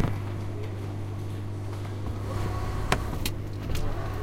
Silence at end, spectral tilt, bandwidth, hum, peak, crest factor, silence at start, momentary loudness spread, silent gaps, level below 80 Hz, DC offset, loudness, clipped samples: 0 s; -6 dB/octave; 16.5 kHz; none; -2 dBFS; 28 dB; 0 s; 6 LU; none; -36 dBFS; under 0.1%; -33 LUFS; under 0.1%